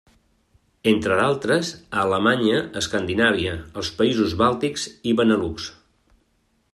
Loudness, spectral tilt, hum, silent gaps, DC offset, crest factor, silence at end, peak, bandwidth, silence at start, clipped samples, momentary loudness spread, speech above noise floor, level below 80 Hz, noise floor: -21 LUFS; -4.5 dB/octave; none; none; under 0.1%; 18 dB; 1 s; -4 dBFS; 13 kHz; 0.85 s; under 0.1%; 9 LU; 45 dB; -52 dBFS; -66 dBFS